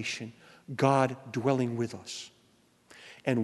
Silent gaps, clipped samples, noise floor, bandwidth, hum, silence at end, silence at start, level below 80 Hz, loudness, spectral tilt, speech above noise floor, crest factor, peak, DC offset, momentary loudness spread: none; under 0.1%; -65 dBFS; 12 kHz; none; 0 s; 0 s; -72 dBFS; -30 LUFS; -6 dB/octave; 35 dB; 22 dB; -10 dBFS; under 0.1%; 21 LU